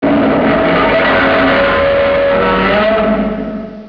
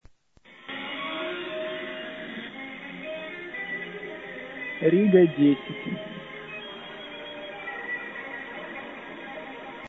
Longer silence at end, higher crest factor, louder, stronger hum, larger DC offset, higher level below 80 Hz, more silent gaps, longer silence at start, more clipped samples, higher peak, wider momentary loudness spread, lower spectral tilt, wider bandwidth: about the same, 0 s vs 0 s; second, 12 dB vs 22 dB; first, -11 LUFS vs -29 LUFS; neither; first, 0.2% vs under 0.1%; first, -32 dBFS vs -68 dBFS; neither; about the same, 0 s vs 0.1 s; neither; first, 0 dBFS vs -6 dBFS; second, 5 LU vs 17 LU; about the same, -8 dB/octave vs -8.5 dB/octave; first, 5.4 kHz vs 4 kHz